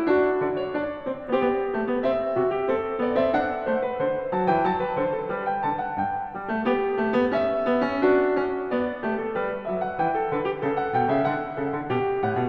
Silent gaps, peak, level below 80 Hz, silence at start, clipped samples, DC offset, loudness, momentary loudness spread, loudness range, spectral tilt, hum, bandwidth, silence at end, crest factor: none; -8 dBFS; -54 dBFS; 0 s; under 0.1%; under 0.1%; -25 LUFS; 6 LU; 2 LU; -8.5 dB/octave; none; 5.8 kHz; 0 s; 16 dB